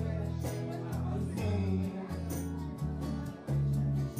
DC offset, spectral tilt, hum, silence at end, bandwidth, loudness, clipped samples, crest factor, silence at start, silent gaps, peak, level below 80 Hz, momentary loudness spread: under 0.1%; -7.5 dB/octave; none; 0 s; 15.5 kHz; -35 LUFS; under 0.1%; 12 dB; 0 s; none; -22 dBFS; -46 dBFS; 6 LU